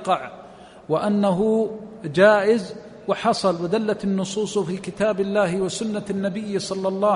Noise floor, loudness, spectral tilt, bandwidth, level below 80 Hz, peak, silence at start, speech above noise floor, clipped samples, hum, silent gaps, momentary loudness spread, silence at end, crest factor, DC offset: -44 dBFS; -22 LUFS; -5.5 dB/octave; 11 kHz; -58 dBFS; -4 dBFS; 0 s; 22 dB; under 0.1%; none; none; 10 LU; 0 s; 18 dB; under 0.1%